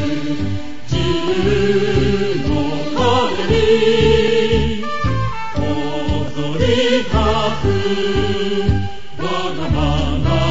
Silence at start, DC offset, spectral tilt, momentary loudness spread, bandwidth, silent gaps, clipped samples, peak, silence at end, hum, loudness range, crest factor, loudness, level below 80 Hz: 0 s; 7%; -6 dB/octave; 9 LU; 8 kHz; none; under 0.1%; -2 dBFS; 0 s; none; 3 LU; 14 dB; -17 LUFS; -28 dBFS